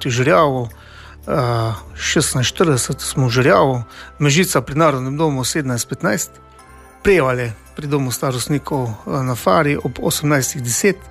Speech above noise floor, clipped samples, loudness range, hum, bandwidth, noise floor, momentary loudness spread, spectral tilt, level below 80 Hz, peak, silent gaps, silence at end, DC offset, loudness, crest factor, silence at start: 25 dB; under 0.1%; 4 LU; none; 15.5 kHz; -42 dBFS; 9 LU; -4.5 dB/octave; -42 dBFS; -2 dBFS; none; 0 s; under 0.1%; -17 LUFS; 16 dB; 0 s